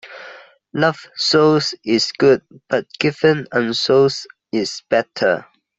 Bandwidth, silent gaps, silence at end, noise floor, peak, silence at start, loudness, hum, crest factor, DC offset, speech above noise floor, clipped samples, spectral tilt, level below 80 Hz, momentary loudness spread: 8.2 kHz; none; 0.35 s; -41 dBFS; -2 dBFS; 0.05 s; -17 LUFS; none; 16 dB; under 0.1%; 24 dB; under 0.1%; -4.5 dB/octave; -60 dBFS; 10 LU